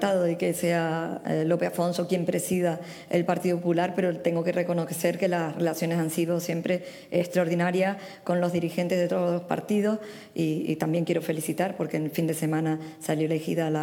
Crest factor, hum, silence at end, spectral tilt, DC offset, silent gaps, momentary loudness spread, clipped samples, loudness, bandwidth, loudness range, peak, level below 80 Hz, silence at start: 16 dB; none; 0 s; -6 dB/octave; under 0.1%; none; 4 LU; under 0.1%; -27 LUFS; 18.5 kHz; 1 LU; -10 dBFS; -72 dBFS; 0 s